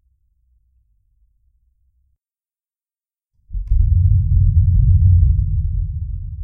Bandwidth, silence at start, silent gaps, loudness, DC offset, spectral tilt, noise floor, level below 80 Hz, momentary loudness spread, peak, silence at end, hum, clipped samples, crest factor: 0.3 kHz; 3.5 s; none; -17 LUFS; under 0.1%; -14 dB/octave; under -90 dBFS; -20 dBFS; 14 LU; -2 dBFS; 0 s; none; under 0.1%; 16 dB